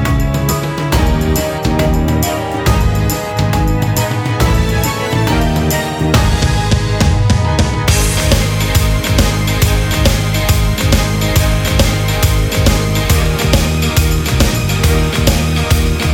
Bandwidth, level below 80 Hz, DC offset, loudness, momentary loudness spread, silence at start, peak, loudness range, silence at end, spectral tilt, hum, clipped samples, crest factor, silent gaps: 20 kHz; -18 dBFS; under 0.1%; -13 LUFS; 3 LU; 0 s; 0 dBFS; 2 LU; 0 s; -5 dB/octave; none; under 0.1%; 12 dB; none